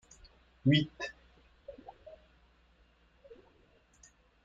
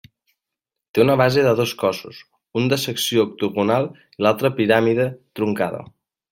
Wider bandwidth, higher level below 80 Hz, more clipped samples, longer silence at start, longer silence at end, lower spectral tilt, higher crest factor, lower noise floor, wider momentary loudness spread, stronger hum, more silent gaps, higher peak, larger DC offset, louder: second, 7.6 kHz vs 16.5 kHz; about the same, -64 dBFS vs -60 dBFS; neither; second, 0.65 s vs 0.95 s; first, 2.75 s vs 0.45 s; about the same, -6.5 dB/octave vs -5.5 dB/octave; first, 24 dB vs 18 dB; second, -66 dBFS vs -85 dBFS; first, 30 LU vs 10 LU; neither; neither; second, -14 dBFS vs -2 dBFS; neither; second, -32 LUFS vs -20 LUFS